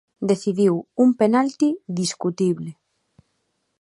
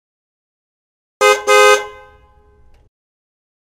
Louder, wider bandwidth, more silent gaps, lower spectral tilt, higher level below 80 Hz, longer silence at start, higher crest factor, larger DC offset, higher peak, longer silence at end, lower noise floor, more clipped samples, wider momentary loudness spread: second, -21 LUFS vs -11 LUFS; second, 11.5 kHz vs 16.5 kHz; neither; first, -6 dB/octave vs 0 dB/octave; second, -70 dBFS vs -54 dBFS; second, 0.2 s vs 1.2 s; about the same, 16 dB vs 18 dB; neither; second, -4 dBFS vs 0 dBFS; second, 1.1 s vs 1.8 s; first, -72 dBFS vs -49 dBFS; neither; about the same, 7 LU vs 8 LU